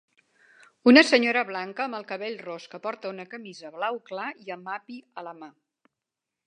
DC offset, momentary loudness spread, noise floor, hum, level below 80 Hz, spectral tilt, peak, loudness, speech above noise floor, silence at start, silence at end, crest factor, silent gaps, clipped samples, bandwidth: under 0.1%; 24 LU; -87 dBFS; none; -82 dBFS; -3.5 dB/octave; -2 dBFS; -24 LUFS; 61 dB; 0.85 s; 1 s; 26 dB; none; under 0.1%; 10 kHz